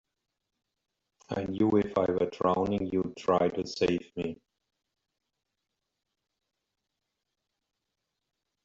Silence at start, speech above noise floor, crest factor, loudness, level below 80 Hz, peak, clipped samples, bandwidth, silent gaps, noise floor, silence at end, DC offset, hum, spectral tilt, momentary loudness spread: 1.3 s; 56 dB; 20 dB; -29 LUFS; -64 dBFS; -12 dBFS; under 0.1%; 7.8 kHz; none; -85 dBFS; 4.3 s; under 0.1%; none; -6 dB/octave; 11 LU